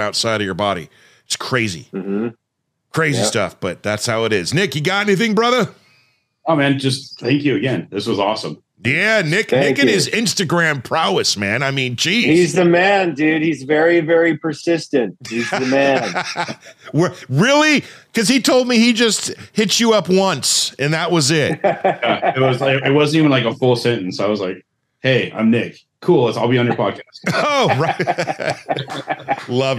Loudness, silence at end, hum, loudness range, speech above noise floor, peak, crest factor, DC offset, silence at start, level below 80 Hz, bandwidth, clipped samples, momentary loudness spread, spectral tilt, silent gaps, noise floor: -16 LUFS; 0 s; none; 4 LU; 57 dB; -4 dBFS; 14 dB; under 0.1%; 0 s; -62 dBFS; 15.5 kHz; under 0.1%; 10 LU; -4.5 dB/octave; none; -73 dBFS